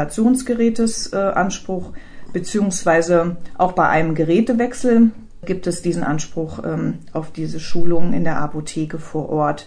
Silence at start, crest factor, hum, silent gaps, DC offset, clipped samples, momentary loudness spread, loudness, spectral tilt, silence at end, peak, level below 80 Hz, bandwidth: 0 s; 14 dB; none; none; under 0.1%; under 0.1%; 12 LU; -20 LUFS; -5.5 dB/octave; 0.05 s; -4 dBFS; -38 dBFS; 10.5 kHz